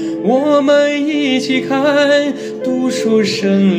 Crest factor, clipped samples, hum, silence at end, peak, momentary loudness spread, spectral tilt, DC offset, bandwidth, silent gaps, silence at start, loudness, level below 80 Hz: 12 dB; under 0.1%; none; 0 s; -2 dBFS; 6 LU; -5.5 dB/octave; under 0.1%; 15.5 kHz; none; 0 s; -14 LUFS; -58 dBFS